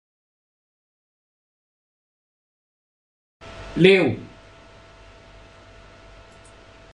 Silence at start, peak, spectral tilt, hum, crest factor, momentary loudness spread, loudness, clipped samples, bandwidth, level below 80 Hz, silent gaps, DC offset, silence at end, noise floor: 3.45 s; -2 dBFS; -6.5 dB/octave; none; 26 dB; 28 LU; -18 LUFS; under 0.1%; 10 kHz; -54 dBFS; none; under 0.1%; 2.7 s; -48 dBFS